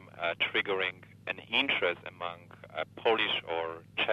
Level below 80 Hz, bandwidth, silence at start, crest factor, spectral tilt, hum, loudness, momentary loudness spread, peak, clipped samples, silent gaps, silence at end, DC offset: -72 dBFS; 12.5 kHz; 0 s; 20 dB; -5 dB/octave; none; -31 LUFS; 13 LU; -12 dBFS; under 0.1%; none; 0 s; under 0.1%